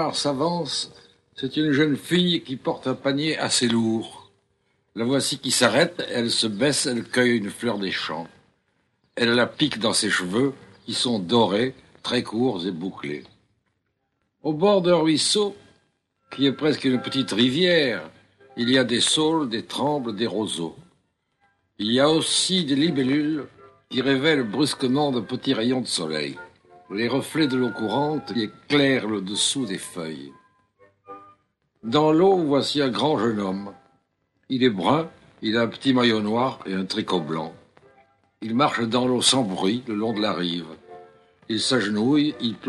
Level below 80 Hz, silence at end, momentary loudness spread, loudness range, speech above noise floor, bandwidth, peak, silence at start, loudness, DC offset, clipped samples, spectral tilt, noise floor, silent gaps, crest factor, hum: -66 dBFS; 0 s; 12 LU; 3 LU; 52 dB; 12.5 kHz; -4 dBFS; 0 s; -22 LUFS; under 0.1%; under 0.1%; -4 dB/octave; -74 dBFS; none; 20 dB; none